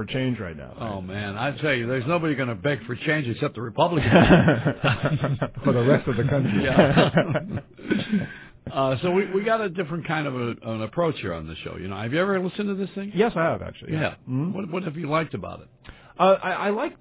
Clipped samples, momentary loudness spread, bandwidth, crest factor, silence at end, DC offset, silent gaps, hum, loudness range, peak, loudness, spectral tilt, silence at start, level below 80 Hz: under 0.1%; 14 LU; 4 kHz; 22 dB; 0.05 s; under 0.1%; none; none; 6 LU; -2 dBFS; -24 LUFS; -11 dB/octave; 0 s; -46 dBFS